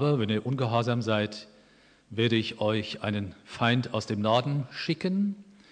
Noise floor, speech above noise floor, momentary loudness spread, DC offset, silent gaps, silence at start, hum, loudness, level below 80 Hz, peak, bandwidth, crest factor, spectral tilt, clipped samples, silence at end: -59 dBFS; 32 dB; 8 LU; under 0.1%; none; 0 s; none; -28 LUFS; -68 dBFS; -10 dBFS; 9.6 kHz; 18 dB; -6.5 dB/octave; under 0.1%; 0.3 s